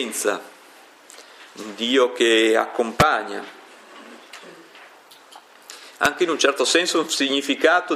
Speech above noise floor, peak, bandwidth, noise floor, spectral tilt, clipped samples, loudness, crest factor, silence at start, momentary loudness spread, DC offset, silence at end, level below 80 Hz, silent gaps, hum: 28 dB; -2 dBFS; 15.5 kHz; -48 dBFS; -2.5 dB/octave; under 0.1%; -19 LUFS; 20 dB; 0 s; 24 LU; under 0.1%; 0 s; -54 dBFS; none; none